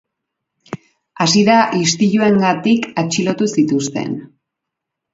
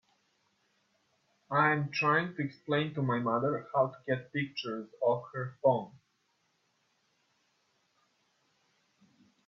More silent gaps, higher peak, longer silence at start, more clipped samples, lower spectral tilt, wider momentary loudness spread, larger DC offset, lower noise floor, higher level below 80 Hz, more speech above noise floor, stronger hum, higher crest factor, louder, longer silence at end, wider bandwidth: neither; first, 0 dBFS vs -14 dBFS; second, 0.7 s vs 1.5 s; neither; second, -4.5 dB/octave vs -7 dB/octave; first, 18 LU vs 9 LU; neither; first, -80 dBFS vs -76 dBFS; first, -60 dBFS vs -76 dBFS; first, 66 dB vs 45 dB; neither; second, 16 dB vs 22 dB; first, -15 LUFS vs -31 LUFS; second, 0.9 s vs 3.5 s; first, 7.8 kHz vs 6.8 kHz